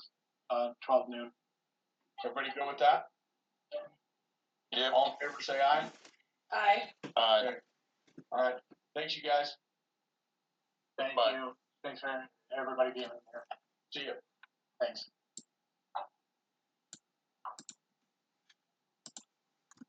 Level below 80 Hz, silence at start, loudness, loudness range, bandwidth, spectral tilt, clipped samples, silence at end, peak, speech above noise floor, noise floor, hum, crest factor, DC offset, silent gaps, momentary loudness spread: under -90 dBFS; 0 s; -34 LUFS; 19 LU; 9 kHz; -2.5 dB/octave; under 0.1%; 0.7 s; -14 dBFS; 53 dB; -87 dBFS; none; 22 dB; under 0.1%; none; 22 LU